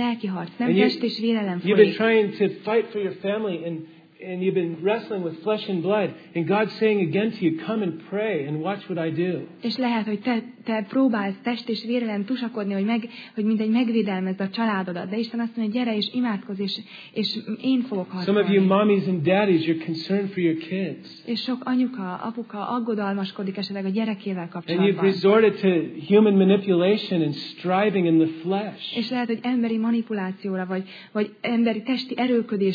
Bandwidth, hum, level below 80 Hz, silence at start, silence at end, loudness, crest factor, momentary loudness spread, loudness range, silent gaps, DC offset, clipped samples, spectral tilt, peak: 5 kHz; none; -80 dBFS; 0 s; 0 s; -24 LUFS; 20 dB; 10 LU; 6 LU; none; under 0.1%; under 0.1%; -8.5 dB/octave; -2 dBFS